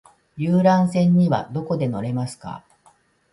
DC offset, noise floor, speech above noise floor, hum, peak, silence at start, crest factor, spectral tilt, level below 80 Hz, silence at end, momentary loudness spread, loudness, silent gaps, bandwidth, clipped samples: under 0.1%; -58 dBFS; 38 dB; none; -4 dBFS; 0.35 s; 16 dB; -8 dB/octave; -58 dBFS; 0.75 s; 17 LU; -20 LUFS; none; 11.5 kHz; under 0.1%